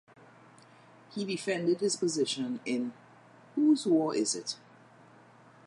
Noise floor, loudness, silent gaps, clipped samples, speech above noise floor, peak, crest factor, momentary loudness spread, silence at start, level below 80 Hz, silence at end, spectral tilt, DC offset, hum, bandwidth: -57 dBFS; -30 LUFS; none; under 0.1%; 27 dB; -16 dBFS; 16 dB; 13 LU; 1.1 s; -86 dBFS; 1.1 s; -4 dB/octave; under 0.1%; none; 11.5 kHz